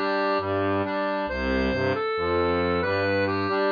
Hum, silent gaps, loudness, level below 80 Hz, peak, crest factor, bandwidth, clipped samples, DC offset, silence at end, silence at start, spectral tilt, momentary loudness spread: none; none; -25 LUFS; -42 dBFS; -12 dBFS; 12 dB; 5.2 kHz; under 0.1%; under 0.1%; 0 s; 0 s; -7.5 dB/octave; 3 LU